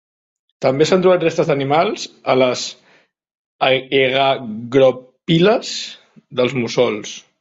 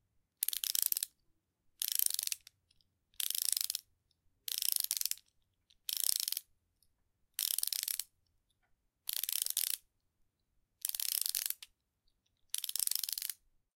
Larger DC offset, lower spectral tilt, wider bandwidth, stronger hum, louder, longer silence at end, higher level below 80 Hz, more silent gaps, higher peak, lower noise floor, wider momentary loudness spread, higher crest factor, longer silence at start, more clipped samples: neither; first, -5 dB/octave vs 5.5 dB/octave; second, 8 kHz vs 17 kHz; neither; first, -17 LUFS vs -35 LUFS; second, 0.2 s vs 0.4 s; first, -58 dBFS vs -80 dBFS; first, 3.35-3.59 s vs none; first, 0 dBFS vs -8 dBFS; second, -55 dBFS vs -79 dBFS; about the same, 12 LU vs 10 LU; second, 16 dB vs 32 dB; first, 0.6 s vs 0.4 s; neither